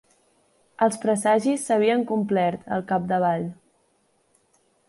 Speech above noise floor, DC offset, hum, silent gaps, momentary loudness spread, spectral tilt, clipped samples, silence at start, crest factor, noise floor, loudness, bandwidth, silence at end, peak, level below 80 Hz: 44 dB; under 0.1%; none; none; 5 LU; -5.5 dB/octave; under 0.1%; 0.8 s; 16 dB; -66 dBFS; -23 LUFS; 11.5 kHz; 1.35 s; -8 dBFS; -66 dBFS